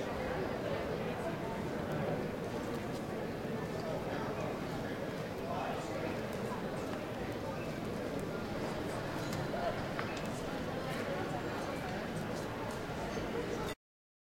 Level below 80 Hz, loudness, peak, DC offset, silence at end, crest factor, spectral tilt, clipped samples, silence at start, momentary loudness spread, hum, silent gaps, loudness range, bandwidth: -56 dBFS; -39 LUFS; -20 dBFS; under 0.1%; 0.55 s; 18 dB; -6 dB/octave; under 0.1%; 0 s; 3 LU; none; none; 1 LU; 16.5 kHz